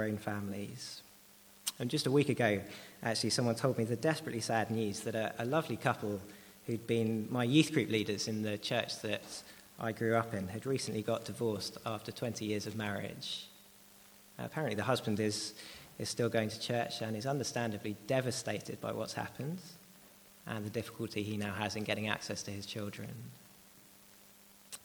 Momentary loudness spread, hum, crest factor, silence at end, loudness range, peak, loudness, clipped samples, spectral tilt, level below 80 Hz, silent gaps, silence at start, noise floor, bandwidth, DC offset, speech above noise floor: 14 LU; none; 24 dB; 0.05 s; 6 LU; -12 dBFS; -36 LUFS; under 0.1%; -5 dB/octave; -72 dBFS; none; 0 s; -60 dBFS; over 20 kHz; under 0.1%; 24 dB